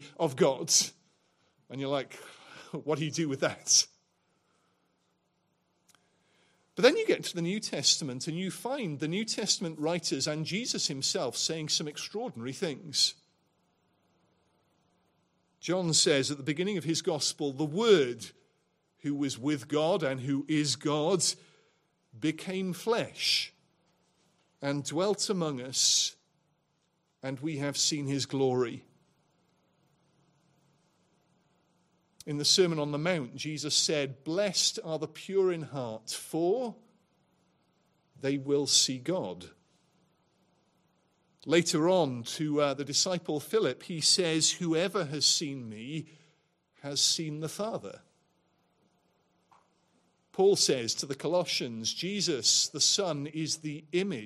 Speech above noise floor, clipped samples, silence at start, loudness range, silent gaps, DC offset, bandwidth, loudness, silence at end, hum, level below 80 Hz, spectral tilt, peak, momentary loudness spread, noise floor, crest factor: 45 dB; under 0.1%; 0 s; 6 LU; none; under 0.1%; 15.5 kHz; -29 LUFS; 0 s; none; -78 dBFS; -3 dB/octave; -6 dBFS; 14 LU; -75 dBFS; 26 dB